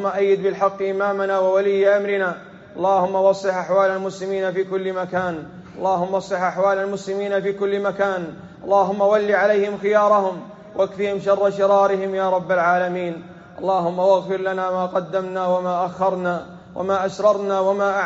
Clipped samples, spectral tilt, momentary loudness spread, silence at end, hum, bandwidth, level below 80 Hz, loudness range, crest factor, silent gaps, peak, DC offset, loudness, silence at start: under 0.1%; -4.5 dB/octave; 9 LU; 0 s; none; 8 kHz; -62 dBFS; 3 LU; 16 dB; none; -4 dBFS; under 0.1%; -20 LUFS; 0 s